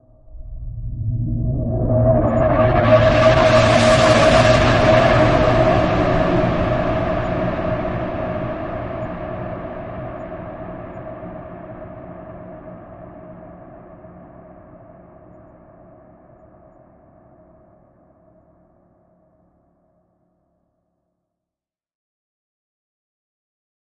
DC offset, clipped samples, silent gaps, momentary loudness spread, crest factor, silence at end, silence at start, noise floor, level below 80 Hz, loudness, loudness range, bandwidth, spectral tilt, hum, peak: under 0.1%; under 0.1%; none; 24 LU; 18 dB; 9.75 s; 0.3 s; -89 dBFS; -32 dBFS; -16 LUFS; 23 LU; 11 kHz; -6.5 dB/octave; none; -2 dBFS